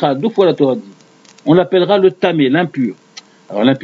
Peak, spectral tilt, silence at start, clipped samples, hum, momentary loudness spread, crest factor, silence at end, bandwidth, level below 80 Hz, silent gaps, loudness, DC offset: 0 dBFS; -7.5 dB/octave; 0 s; under 0.1%; none; 12 LU; 14 dB; 0 s; 7.4 kHz; -62 dBFS; none; -14 LUFS; under 0.1%